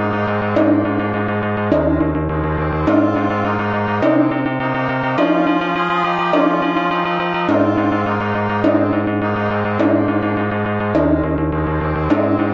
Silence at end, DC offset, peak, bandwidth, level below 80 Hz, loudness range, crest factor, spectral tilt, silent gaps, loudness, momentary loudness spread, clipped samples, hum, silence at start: 0 s; under 0.1%; -2 dBFS; 6.8 kHz; -34 dBFS; 1 LU; 14 dB; -6 dB/octave; none; -17 LUFS; 4 LU; under 0.1%; none; 0 s